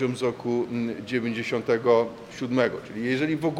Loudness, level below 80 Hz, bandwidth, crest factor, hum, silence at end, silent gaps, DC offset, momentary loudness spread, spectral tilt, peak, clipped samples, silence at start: -26 LUFS; -64 dBFS; 12.5 kHz; 18 dB; none; 0 s; none; under 0.1%; 8 LU; -6.5 dB/octave; -8 dBFS; under 0.1%; 0 s